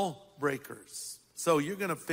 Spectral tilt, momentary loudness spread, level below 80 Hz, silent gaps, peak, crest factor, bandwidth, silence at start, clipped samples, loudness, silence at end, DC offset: -4.5 dB/octave; 12 LU; -76 dBFS; none; -14 dBFS; 20 dB; 16 kHz; 0 s; under 0.1%; -33 LUFS; 0 s; under 0.1%